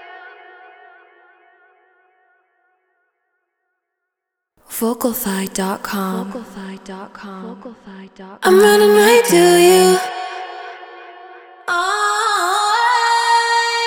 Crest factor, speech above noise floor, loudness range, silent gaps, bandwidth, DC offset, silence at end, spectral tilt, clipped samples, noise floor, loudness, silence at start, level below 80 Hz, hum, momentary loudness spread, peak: 16 dB; 66 dB; 13 LU; none; 20 kHz; under 0.1%; 0 s; -3.5 dB/octave; under 0.1%; -80 dBFS; -14 LUFS; 0 s; -60 dBFS; none; 24 LU; -2 dBFS